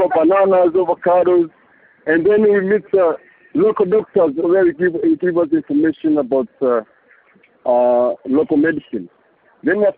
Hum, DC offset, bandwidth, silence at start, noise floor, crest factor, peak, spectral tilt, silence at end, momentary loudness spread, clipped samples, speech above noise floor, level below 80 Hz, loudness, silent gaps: none; under 0.1%; 4.3 kHz; 0 s; -53 dBFS; 14 dB; -2 dBFS; -6.5 dB/octave; 0.05 s; 10 LU; under 0.1%; 38 dB; -58 dBFS; -16 LUFS; none